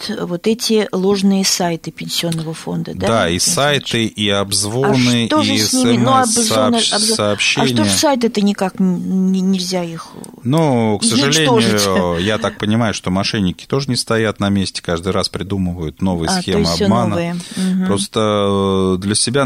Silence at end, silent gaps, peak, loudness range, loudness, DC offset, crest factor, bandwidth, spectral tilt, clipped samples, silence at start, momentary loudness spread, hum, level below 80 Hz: 0 s; none; -2 dBFS; 4 LU; -15 LUFS; under 0.1%; 14 dB; 16 kHz; -4 dB/octave; under 0.1%; 0 s; 8 LU; none; -44 dBFS